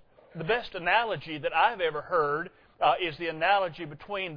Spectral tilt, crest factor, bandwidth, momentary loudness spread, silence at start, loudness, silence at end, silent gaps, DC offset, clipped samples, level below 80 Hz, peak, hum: -7 dB/octave; 20 dB; 5.4 kHz; 11 LU; 0.35 s; -28 LUFS; 0 s; none; under 0.1%; under 0.1%; -58 dBFS; -10 dBFS; none